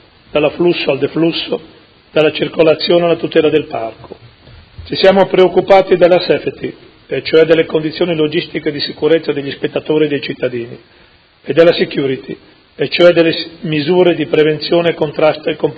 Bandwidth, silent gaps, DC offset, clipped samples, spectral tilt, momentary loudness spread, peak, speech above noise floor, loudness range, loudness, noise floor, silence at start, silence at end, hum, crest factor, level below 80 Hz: 8 kHz; none; under 0.1%; 0.3%; -7.5 dB/octave; 12 LU; 0 dBFS; 28 dB; 4 LU; -13 LUFS; -40 dBFS; 0.35 s; 0 s; none; 14 dB; -48 dBFS